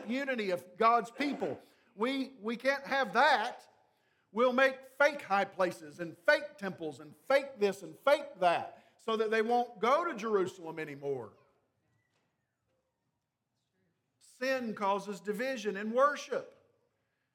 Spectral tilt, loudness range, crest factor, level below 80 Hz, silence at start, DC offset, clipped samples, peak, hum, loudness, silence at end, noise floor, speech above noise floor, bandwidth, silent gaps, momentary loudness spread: -4.5 dB/octave; 9 LU; 22 dB; -90 dBFS; 0 s; under 0.1%; under 0.1%; -12 dBFS; none; -32 LUFS; 0.85 s; -84 dBFS; 52 dB; 16.5 kHz; none; 13 LU